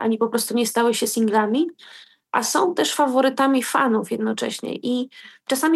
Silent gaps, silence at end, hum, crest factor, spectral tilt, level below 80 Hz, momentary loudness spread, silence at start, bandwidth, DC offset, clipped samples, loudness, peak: none; 0 s; none; 16 dB; -3 dB/octave; -80 dBFS; 8 LU; 0 s; 13 kHz; under 0.1%; under 0.1%; -21 LUFS; -4 dBFS